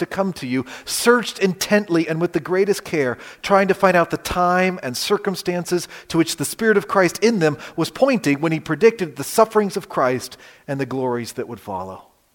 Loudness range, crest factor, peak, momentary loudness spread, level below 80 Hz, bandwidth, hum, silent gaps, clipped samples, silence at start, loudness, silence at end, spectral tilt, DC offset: 2 LU; 20 dB; 0 dBFS; 10 LU; -52 dBFS; 17 kHz; none; none; under 0.1%; 0 s; -20 LUFS; 0.35 s; -4.5 dB/octave; under 0.1%